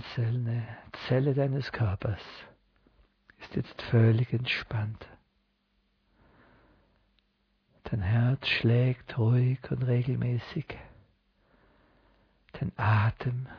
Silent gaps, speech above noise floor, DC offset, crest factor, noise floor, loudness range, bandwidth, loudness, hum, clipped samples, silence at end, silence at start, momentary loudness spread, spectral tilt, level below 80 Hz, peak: none; 45 dB; under 0.1%; 18 dB; -73 dBFS; 7 LU; 5.4 kHz; -29 LUFS; none; under 0.1%; 0 s; 0 s; 16 LU; -8.5 dB/octave; -56 dBFS; -12 dBFS